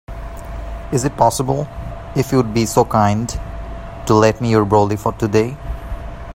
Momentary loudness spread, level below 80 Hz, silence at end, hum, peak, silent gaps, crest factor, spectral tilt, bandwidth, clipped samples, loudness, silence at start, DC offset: 17 LU; -32 dBFS; 0 s; none; 0 dBFS; none; 18 dB; -6 dB/octave; 16 kHz; under 0.1%; -17 LUFS; 0.1 s; under 0.1%